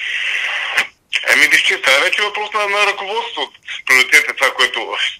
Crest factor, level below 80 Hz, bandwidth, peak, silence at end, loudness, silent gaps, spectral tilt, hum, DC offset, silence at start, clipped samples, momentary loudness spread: 16 dB; -64 dBFS; over 20 kHz; 0 dBFS; 0 s; -13 LUFS; none; 1 dB/octave; none; under 0.1%; 0 s; under 0.1%; 12 LU